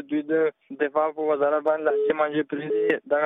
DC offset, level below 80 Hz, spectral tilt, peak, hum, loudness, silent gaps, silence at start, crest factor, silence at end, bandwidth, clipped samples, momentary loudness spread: under 0.1%; -74 dBFS; -8 dB/octave; -10 dBFS; none; -24 LUFS; none; 0 s; 14 dB; 0 s; 3.9 kHz; under 0.1%; 5 LU